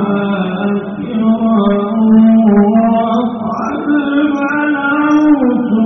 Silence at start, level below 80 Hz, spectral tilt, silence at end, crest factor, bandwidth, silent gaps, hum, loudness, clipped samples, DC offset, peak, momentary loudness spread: 0 s; -48 dBFS; -6.5 dB/octave; 0 s; 10 dB; 6.2 kHz; none; none; -12 LUFS; under 0.1%; under 0.1%; 0 dBFS; 9 LU